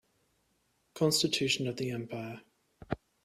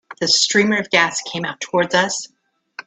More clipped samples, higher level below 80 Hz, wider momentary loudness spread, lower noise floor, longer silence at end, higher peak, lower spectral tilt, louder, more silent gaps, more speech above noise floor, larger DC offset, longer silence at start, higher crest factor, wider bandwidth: neither; about the same, -64 dBFS vs -64 dBFS; about the same, 14 LU vs 12 LU; first, -75 dBFS vs -40 dBFS; first, 0.3 s vs 0.05 s; second, -14 dBFS vs 0 dBFS; first, -4 dB/octave vs -2.5 dB/octave; second, -32 LUFS vs -17 LUFS; neither; first, 43 dB vs 22 dB; neither; first, 0.95 s vs 0.1 s; about the same, 20 dB vs 20 dB; first, 15.5 kHz vs 9.4 kHz